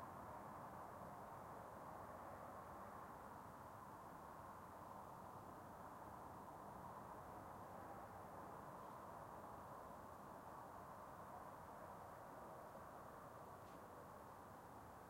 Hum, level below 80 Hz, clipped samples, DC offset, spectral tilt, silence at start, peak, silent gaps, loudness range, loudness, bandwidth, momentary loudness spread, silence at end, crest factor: none; -76 dBFS; under 0.1%; under 0.1%; -6 dB/octave; 0 s; -44 dBFS; none; 1 LU; -57 LUFS; 16.5 kHz; 2 LU; 0 s; 14 dB